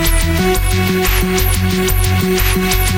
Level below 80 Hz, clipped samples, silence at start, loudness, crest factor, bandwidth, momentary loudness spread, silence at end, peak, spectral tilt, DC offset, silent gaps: -18 dBFS; under 0.1%; 0 s; -14 LUFS; 12 dB; 17.5 kHz; 1 LU; 0 s; -2 dBFS; -4.5 dB/octave; under 0.1%; none